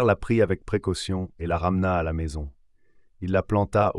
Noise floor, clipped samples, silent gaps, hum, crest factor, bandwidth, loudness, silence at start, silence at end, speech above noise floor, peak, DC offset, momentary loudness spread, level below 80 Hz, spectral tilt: -56 dBFS; under 0.1%; none; none; 16 dB; 11.5 kHz; -25 LUFS; 0 s; 0 s; 32 dB; -8 dBFS; under 0.1%; 10 LU; -42 dBFS; -7 dB/octave